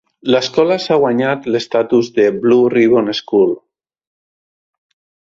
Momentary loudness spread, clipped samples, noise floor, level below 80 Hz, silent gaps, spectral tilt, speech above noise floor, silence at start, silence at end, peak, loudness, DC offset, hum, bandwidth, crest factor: 5 LU; under 0.1%; under -90 dBFS; -58 dBFS; none; -5.5 dB/octave; over 77 dB; 0.25 s; 1.75 s; -2 dBFS; -14 LUFS; under 0.1%; none; 7.6 kHz; 14 dB